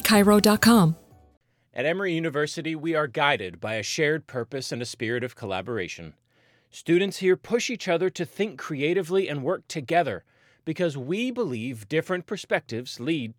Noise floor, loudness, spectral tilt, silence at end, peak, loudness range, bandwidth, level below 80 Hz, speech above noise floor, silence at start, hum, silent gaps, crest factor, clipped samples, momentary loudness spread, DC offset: -64 dBFS; -25 LUFS; -5 dB/octave; 0.05 s; -6 dBFS; 5 LU; 19 kHz; -58 dBFS; 39 dB; 0 s; none; 1.37-1.41 s; 20 dB; under 0.1%; 14 LU; under 0.1%